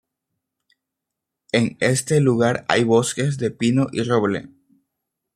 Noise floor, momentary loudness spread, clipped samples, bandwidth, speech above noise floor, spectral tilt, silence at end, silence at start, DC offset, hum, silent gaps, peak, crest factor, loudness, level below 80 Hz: -83 dBFS; 6 LU; under 0.1%; 15 kHz; 64 dB; -5.5 dB/octave; 0.9 s; 1.55 s; under 0.1%; none; none; -2 dBFS; 20 dB; -20 LUFS; -60 dBFS